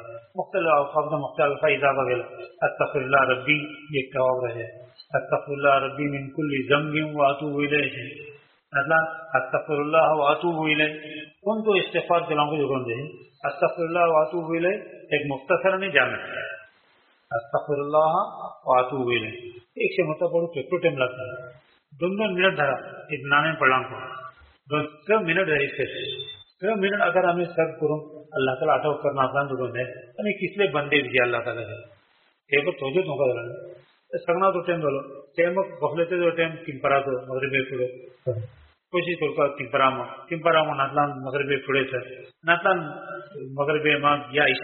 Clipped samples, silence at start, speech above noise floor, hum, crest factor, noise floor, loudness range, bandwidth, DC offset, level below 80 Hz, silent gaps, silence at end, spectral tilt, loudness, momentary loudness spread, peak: under 0.1%; 0 s; 40 dB; none; 22 dB; -64 dBFS; 3 LU; 4.3 kHz; under 0.1%; -66 dBFS; none; 0 s; -3 dB/octave; -24 LUFS; 13 LU; -2 dBFS